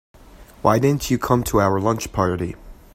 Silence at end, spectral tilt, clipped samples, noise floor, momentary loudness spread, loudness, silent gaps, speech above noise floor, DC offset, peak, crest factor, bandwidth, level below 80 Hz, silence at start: 0.2 s; -6 dB/octave; under 0.1%; -45 dBFS; 9 LU; -20 LUFS; none; 26 dB; under 0.1%; 0 dBFS; 20 dB; 16 kHz; -40 dBFS; 0.35 s